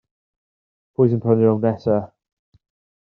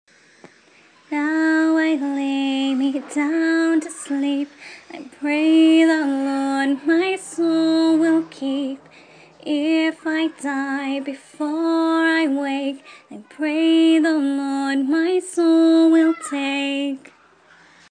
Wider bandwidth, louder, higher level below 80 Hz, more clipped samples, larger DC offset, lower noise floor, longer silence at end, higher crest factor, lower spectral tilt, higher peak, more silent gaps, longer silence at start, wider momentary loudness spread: second, 5.4 kHz vs 9.8 kHz; about the same, -19 LUFS vs -19 LUFS; first, -62 dBFS vs -78 dBFS; neither; neither; first, under -90 dBFS vs -52 dBFS; about the same, 0.95 s vs 0.9 s; about the same, 18 dB vs 14 dB; first, -10.5 dB/octave vs -3 dB/octave; about the same, -4 dBFS vs -6 dBFS; neither; about the same, 1 s vs 1.1 s; about the same, 12 LU vs 13 LU